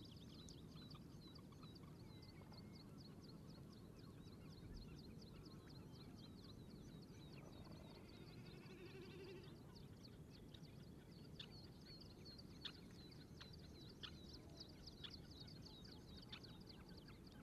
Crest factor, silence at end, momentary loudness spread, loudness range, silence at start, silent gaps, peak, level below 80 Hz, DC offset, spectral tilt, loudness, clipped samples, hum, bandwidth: 20 dB; 0 s; 4 LU; 2 LU; 0 s; none; -40 dBFS; -70 dBFS; under 0.1%; -5.5 dB/octave; -59 LUFS; under 0.1%; none; 13 kHz